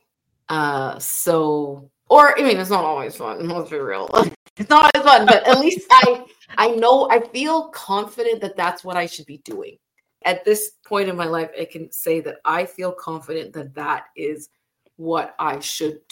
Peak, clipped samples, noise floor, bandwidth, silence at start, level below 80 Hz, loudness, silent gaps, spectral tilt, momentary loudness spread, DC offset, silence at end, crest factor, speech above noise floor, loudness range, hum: 0 dBFS; under 0.1%; -47 dBFS; 17 kHz; 0.5 s; -62 dBFS; -18 LUFS; 4.36-4.56 s; -3.5 dB/octave; 18 LU; under 0.1%; 0.15 s; 18 dB; 29 dB; 12 LU; none